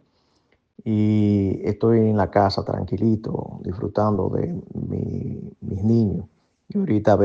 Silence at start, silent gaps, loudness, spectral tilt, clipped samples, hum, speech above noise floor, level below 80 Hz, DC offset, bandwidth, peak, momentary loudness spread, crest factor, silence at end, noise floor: 0.85 s; none; -22 LUFS; -9.5 dB/octave; under 0.1%; none; 44 dB; -52 dBFS; under 0.1%; 7 kHz; -4 dBFS; 12 LU; 18 dB; 0 s; -65 dBFS